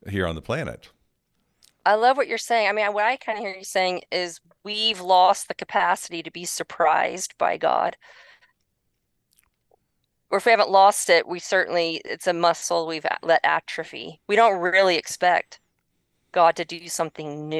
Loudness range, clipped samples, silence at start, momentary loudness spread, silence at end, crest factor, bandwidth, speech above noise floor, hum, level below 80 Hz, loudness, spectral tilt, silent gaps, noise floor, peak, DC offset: 5 LU; under 0.1%; 0.05 s; 12 LU; 0 s; 20 dB; 12.5 kHz; 52 dB; none; -60 dBFS; -22 LUFS; -2.5 dB/octave; none; -74 dBFS; -4 dBFS; under 0.1%